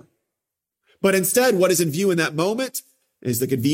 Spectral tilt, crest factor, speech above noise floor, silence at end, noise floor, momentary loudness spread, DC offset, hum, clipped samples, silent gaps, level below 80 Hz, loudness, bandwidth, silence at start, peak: -4.5 dB/octave; 18 dB; 65 dB; 0 s; -84 dBFS; 10 LU; under 0.1%; none; under 0.1%; none; -64 dBFS; -20 LUFS; 16.5 kHz; 1.05 s; -4 dBFS